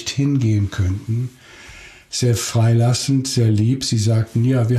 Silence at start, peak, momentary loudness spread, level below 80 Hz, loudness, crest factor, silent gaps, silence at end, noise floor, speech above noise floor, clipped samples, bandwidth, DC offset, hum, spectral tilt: 0 s; -8 dBFS; 8 LU; -46 dBFS; -18 LUFS; 10 dB; none; 0 s; -40 dBFS; 22 dB; under 0.1%; 13.5 kHz; under 0.1%; none; -5.5 dB/octave